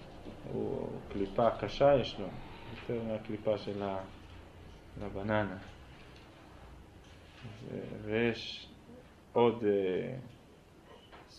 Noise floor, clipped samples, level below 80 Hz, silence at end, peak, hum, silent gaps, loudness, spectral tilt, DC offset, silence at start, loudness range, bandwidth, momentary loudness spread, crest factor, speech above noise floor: -58 dBFS; under 0.1%; -56 dBFS; 0 s; -14 dBFS; none; none; -34 LUFS; -7 dB/octave; under 0.1%; 0 s; 8 LU; 11 kHz; 25 LU; 22 dB; 25 dB